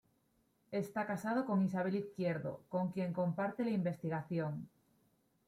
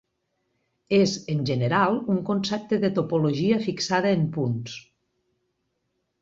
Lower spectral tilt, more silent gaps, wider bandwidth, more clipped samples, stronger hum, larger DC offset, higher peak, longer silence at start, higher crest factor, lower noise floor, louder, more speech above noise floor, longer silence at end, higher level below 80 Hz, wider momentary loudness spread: first, -8.5 dB/octave vs -6 dB/octave; neither; first, 14.5 kHz vs 7.8 kHz; neither; neither; neither; second, -24 dBFS vs -6 dBFS; second, 0.7 s vs 0.9 s; about the same, 14 dB vs 18 dB; about the same, -76 dBFS vs -76 dBFS; second, -38 LUFS vs -24 LUFS; second, 39 dB vs 53 dB; second, 0.8 s vs 1.4 s; second, -78 dBFS vs -62 dBFS; about the same, 7 LU vs 6 LU